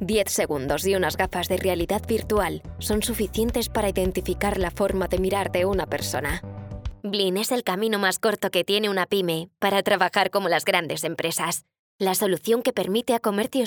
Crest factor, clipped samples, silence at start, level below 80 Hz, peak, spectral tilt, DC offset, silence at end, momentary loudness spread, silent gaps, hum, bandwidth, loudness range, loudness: 20 dB; under 0.1%; 0 s; -40 dBFS; -4 dBFS; -4 dB/octave; under 0.1%; 0 s; 6 LU; 11.79-11.99 s; none; over 20 kHz; 3 LU; -24 LUFS